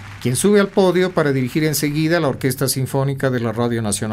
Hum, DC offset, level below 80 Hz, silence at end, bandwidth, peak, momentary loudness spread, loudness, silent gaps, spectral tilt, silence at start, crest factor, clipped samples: none; under 0.1%; -48 dBFS; 0 s; 16 kHz; -2 dBFS; 6 LU; -18 LUFS; none; -5 dB/octave; 0 s; 16 dB; under 0.1%